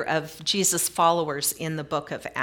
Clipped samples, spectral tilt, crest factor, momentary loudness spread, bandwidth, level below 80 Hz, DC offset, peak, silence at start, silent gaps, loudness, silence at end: under 0.1%; -2.5 dB/octave; 18 dB; 9 LU; 18 kHz; -62 dBFS; under 0.1%; -8 dBFS; 0 s; none; -24 LUFS; 0 s